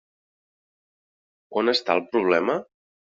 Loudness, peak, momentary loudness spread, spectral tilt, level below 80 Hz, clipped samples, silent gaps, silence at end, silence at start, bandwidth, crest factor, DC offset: -23 LUFS; -4 dBFS; 8 LU; -2 dB/octave; -72 dBFS; under 0.1%; none; 0.5 s; 1.5 s; 7.4 kHz; 22 dB; under 0.1%